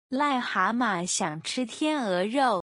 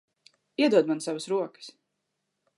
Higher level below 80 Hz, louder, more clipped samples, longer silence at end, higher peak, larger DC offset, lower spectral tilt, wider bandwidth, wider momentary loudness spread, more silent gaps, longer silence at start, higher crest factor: first, -72 dBFS vs -86 dBFS; about the same, -27 LUFS vs -26 LUFS; neither; second, 0.1 s vs 0.9 s; about the same, -10 dBFS vs -10 dBFS; neither; about the same, -3.5 dB/octave vs -4.5 dB/octave; about the same, 11 kHz vs 11.5 kHz; second, 5 LU vs 21 LU; neither; second, 0.1 s vs 0.6 s; about the same, 16 dB vs 20 dB